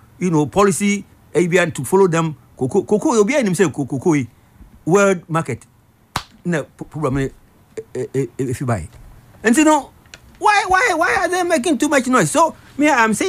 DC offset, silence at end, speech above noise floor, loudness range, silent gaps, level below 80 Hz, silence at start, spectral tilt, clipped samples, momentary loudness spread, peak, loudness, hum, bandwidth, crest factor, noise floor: under 0.1%; 0 s; 29 dB; 8 LU; none; -46 dBFS; 0.2 s; -5 dB/octave; under 0.1%; 14 LU; -4 dBFS; -17 LUFS; none; 15.5 kHz; 14 dB; -45 dBFS